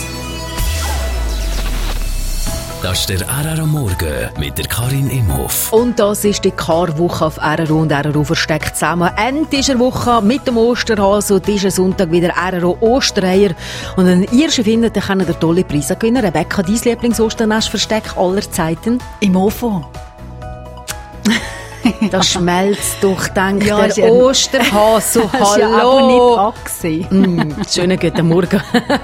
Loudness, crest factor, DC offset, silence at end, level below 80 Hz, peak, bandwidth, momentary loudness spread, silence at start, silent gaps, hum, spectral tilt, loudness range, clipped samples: -14 LUFS; 14 dB; under 0.1%; 0 s; -28 dBFS; 0 dBFS; 16.5 kHz; 10 LU; 0 s; none; none; -4.5 dB/octave; 7 LU; under 0.1%